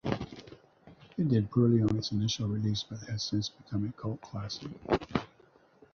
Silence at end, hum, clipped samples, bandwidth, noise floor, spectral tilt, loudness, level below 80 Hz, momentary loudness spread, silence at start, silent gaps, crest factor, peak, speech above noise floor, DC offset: 0.7 s; none; under 0.1%; 7 kHz; -62 dBFS; -6.5 dB/octave; -32 LUFS; -56 dBFS; 13 LU; 0.05 s; none; 22 dB; -10 dBFS; 32 dB; under 0.1%